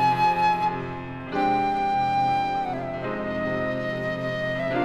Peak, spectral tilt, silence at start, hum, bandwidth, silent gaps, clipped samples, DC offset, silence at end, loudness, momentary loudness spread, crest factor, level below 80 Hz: -10 dBFS; -6.5 dB/octave; 0 s; none; 12.5 kHz; none; under 0.1%; under 0.1%; 0 s; -25 LUFS; 9 LU; 14 dB; -50 dBFS